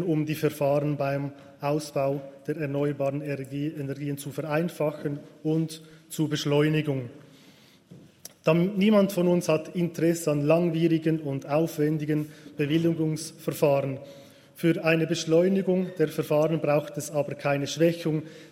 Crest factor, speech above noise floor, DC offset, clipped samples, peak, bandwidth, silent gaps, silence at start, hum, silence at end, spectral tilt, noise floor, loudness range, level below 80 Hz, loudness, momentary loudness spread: 18 dB; 29 dB; under 0.1%; under 0.1%; -8 dBFS; 16 kHz; none; 0 s; none; 0.05 s; -6.5 dB/octave; -55 dBFS; 6 LU; -68 dBFS; -26 LUFS; 10 LU